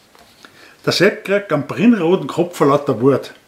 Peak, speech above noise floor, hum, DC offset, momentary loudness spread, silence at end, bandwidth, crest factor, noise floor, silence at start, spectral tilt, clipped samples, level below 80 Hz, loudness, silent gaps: 0 dBFS; 30 dB; none; under 0.1%; 6 LU; 0.15 s; 15.5 kHz; 16 dB; -46 dBFS; 0.85 s; -6 dB/octave; under 0.1%; -64 dBFS; -16 LUFS; none